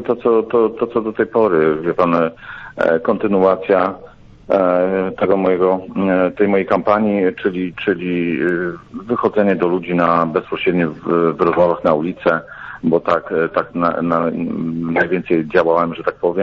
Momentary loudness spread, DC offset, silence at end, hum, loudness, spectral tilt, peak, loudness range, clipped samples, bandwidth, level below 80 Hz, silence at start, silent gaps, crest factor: 6 LU; under 0.1%; 0 s; none; -17 LUFS; -9 dB/octave; -2 dBFS; 2 LU; under 0.1%; 6.2 kHz; -50 dBFS; 0 s; none; 14 dB